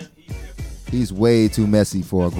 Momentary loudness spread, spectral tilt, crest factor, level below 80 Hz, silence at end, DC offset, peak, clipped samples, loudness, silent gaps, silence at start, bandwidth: 19 LU; -6.5 dB/octave; 16 dB; -36 dBFS; 0 s; under 0.1%; -2 dBFS; under 0.1%; -18 LUFS; none; 0 s; 17 kHz